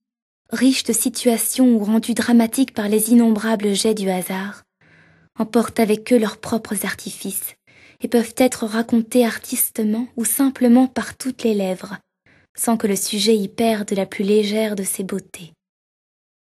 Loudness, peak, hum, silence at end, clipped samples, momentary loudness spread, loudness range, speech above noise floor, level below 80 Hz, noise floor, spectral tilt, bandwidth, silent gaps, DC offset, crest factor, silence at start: -19 LUFS; -2 dBFS; none; 1 s; under 0.1%; 12 LU; 5 LU; 35 dB; -62 dBFS; -53 dBFS; -4 dB/octave; 13 kHz; 12.49-12.55 s; under 0.1%; 18 dB; 0.5 s